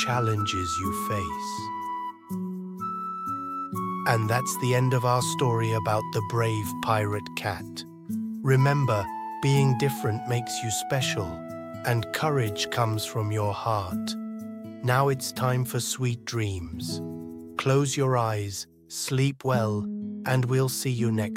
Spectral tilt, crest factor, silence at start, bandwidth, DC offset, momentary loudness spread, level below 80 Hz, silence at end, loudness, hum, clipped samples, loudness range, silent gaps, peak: -5 dB/octave; 20 dB; 0 s; 16.5 kHz; under 0.1%; 11 LU; -58 dBFS; 0 s; -27 LUFS; none; under 0.1%; 3 LU; none; -8 dBFS